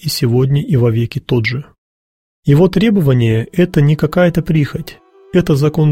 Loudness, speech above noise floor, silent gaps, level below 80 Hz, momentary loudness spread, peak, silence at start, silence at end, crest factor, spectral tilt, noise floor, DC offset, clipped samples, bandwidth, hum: -14 LUFS; over 78 dB; 1.78-2.43 s; -38 dBFS; 8 LU; 0 dBFS; 0.05 s; 0 s; 12 dB; -7.5 dB/octave; under -90 dBFS; under 0.1%; under 0.1%; 16.5 kHz; none